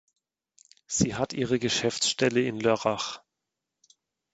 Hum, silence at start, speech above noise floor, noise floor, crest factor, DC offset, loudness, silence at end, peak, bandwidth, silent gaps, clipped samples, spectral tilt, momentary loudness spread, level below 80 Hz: none; 0.9 s; 59 dB; -86 dBFS; 20 dB; under 0.1%; -27 LUFS; 1.15 s; -8 dBFS; 9 kHz; none; under 0.1%; -3.5 dB/octave; 8 LU; -58 dBFS